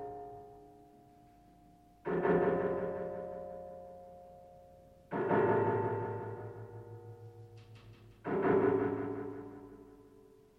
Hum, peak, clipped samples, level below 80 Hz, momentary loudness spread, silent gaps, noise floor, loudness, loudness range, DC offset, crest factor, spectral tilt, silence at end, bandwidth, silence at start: none; -18 dBFS; under 0.1%; -66 dBFS; 25 LU; none; -62 dBFS; -34 LUFS; 1 LU; under 0.1%; 18 dB; -9.5 dB/octave; 0.4 s; 5 kHz; 0 s